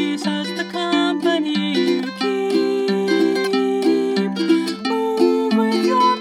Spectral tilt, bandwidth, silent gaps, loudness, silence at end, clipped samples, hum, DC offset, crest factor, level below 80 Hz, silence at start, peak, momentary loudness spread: -5 dB/octave; 15 kHz; none; -19 LUFS; 0 s; under 0.1%; none; under 0.1%; 14 dB; -70 dBFS; 0 s; -4 dBFS; 5 LU